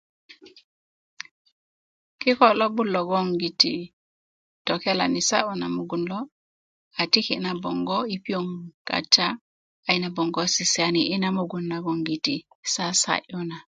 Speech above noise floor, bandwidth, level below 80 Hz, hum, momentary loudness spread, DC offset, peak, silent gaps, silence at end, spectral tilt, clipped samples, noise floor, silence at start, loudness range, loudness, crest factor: over 66 dB; 9.6 kHz; -68 dBFS; none; 14 LU; under 0.1%; -2 dBFS; 0.64-1.17 s, 1.31-1.45 s, 1.52-2.18 s, 3.93-4.65 s, 6.32-6.91 s, 8.74-8.85 s, 9.41-9.83 s, 12.55-12.63 s; 0.15 s; -3 dB/octave; under 0.1%; under -90 dBFS; 0.3 s; 4 LU; -24 LUFS; 24 dB